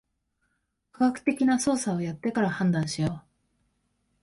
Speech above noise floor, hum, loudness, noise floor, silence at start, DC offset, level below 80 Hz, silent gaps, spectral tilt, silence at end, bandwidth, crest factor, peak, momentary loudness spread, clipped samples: 50 dB; none; -26 LUFS; -76 dBFS; 1 s; under 0.1%; -60 dBFS; none; -5.5 dB/octave; 1 s; 11.5 kHz; 18 dB; -10 dBFS; 6 LU; under 0.1%